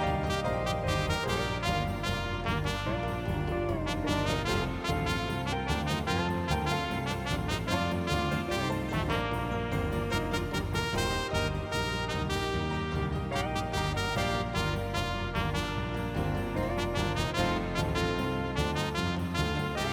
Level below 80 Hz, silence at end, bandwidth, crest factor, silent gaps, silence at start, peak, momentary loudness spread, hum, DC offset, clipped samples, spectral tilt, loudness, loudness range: -40 dBFS; 0 s; 20 kHz; 18 dB; none; 0 s; -12 dBFS; 2 LU; none; under 0.1%; under 0.1%; -5.5 dB/octave; -31 LUFS; 1 LU